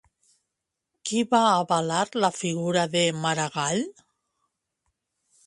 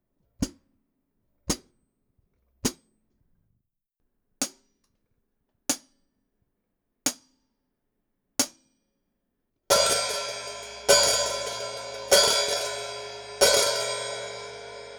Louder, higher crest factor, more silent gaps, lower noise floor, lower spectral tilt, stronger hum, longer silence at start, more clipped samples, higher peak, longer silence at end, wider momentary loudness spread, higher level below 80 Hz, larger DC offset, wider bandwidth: about the same, -24 LUFS vs -25 LUFS; second, 20 dB vs 26 dB; neither; first, -84 dBFS vs -79 dBFS; first, -4 dB/octave vs -1 dB/octave; neither; first, 1.05 s vs 0.4 s; neither; about the same, -6 dBFS vs -4 dBFS; first, 1.55 s vs 0 s; second, 8 LU vs 17 LU; second, -68 dBFS vs -54 dBFS; neither; second, 11.5 kHz vs over 20 kHz